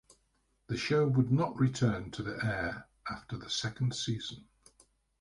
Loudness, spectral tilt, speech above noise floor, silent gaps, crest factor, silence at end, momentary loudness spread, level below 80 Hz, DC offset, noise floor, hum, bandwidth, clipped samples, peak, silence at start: -33 LUFS; -5.5 dB/octave; 43 dB; none; 18 dB; 0.8 s; 14 LU; -58 dBFS; under 0.1%; -74 dBFS; none; 11.5 kHz; under 0.1%; -16 dBFS; 0.7 s